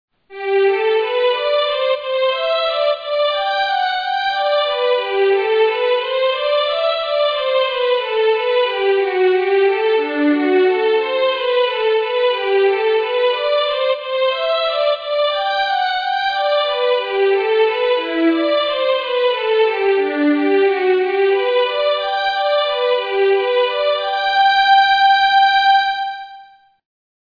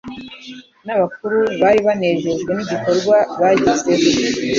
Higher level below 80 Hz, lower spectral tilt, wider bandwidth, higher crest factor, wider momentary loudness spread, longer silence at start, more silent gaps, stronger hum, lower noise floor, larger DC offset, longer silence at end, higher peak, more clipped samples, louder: second, -64 dBFS vs -52 dBFS; second, -3 dB/octave vs -4.5 dB/octave; second, 5.2 kHz vs 7.8 kHz; about the same, 14 dB vs 14 dB; second, 4 LU vs 19 LU; first, 0.3 s vs 0.05 s; neither; neither; first, -44 dBFS vs -37 dBFS; neither; first, 0.8 s vs 0 s; about the same, -2 dBFS vs -2 dBFS; neither; about the same, -16 LUFS vs -16 LUFS